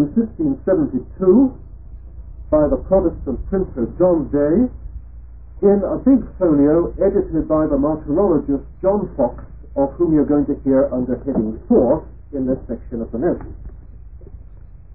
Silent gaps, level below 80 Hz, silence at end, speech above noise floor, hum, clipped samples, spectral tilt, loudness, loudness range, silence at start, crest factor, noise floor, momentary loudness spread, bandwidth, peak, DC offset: none; -34 dBFS; 0 s; 22 dB; none; under 0.1%; -16 dB/octave; -18 LUFS; 3 LU; 0 s; 14 dB; -39 dBFS; 12 LU; 2.3 kHz; -4 dBFS; 0.7%